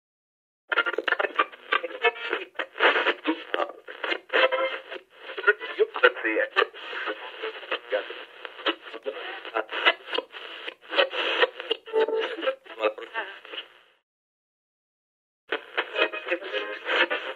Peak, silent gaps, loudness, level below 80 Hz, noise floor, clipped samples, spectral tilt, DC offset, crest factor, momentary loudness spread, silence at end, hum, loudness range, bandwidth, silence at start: -2 dBFS; 14.03-15.48 s; -26 LUFS; -86 dBFS; under -90 dBFS; under 0.1%; -1.5 dB/octave; under 0.1%; 26 dB; 14 LU; 0 s; 60 Hz at -85 dBFS; 7 LU; 10.5 kHz; 0.7 s